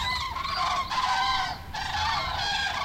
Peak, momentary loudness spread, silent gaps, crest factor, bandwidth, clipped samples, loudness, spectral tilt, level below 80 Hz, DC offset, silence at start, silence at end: -14 dBFS; 5 LU; none; 14 dB; 16 kHz; under 0.1%; -27 LUFS; -2 dB/octave; -44 dBFS; under 0.1%; 0 s; 0 s